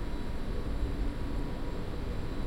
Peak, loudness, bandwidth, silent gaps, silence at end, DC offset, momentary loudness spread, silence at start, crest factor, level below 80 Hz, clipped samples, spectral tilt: -18 dBFS; -38 LUFS; 11.5 kHz; none; 0 s; under 0.1%; 3 LU; 0 s; 14 dB; -36 dBFS; under 0.1%; -7 dB/octave